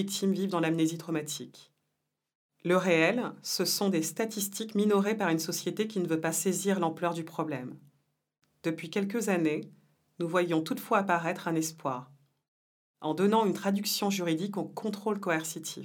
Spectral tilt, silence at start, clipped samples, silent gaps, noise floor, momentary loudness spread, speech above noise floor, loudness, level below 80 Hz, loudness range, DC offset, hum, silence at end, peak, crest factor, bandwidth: -4.5 dB/octave; 0 s; under 0.1%; 2.35-2.49 s, 12.48-12.94 s; -83 dBFS; 10 LU; 53 dB; -30 LUFS; -86 dBFS; 4 LU; under 0.1%; none; 0 s; -10 dBFS; 20 dB; 19.5 kHz